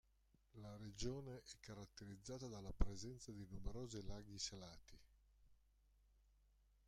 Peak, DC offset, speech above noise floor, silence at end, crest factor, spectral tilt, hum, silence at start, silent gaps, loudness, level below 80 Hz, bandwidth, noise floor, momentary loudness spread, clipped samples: -22 dBFS; under 0.1%; 29 dB; 1.3 s; 28 dB; -4.5 dB/octave; none; 0.55 s; none; -53 LUFS; -54 dBFS; 12.5 kHz; -78 dBFS; 11 LU; under 0.1%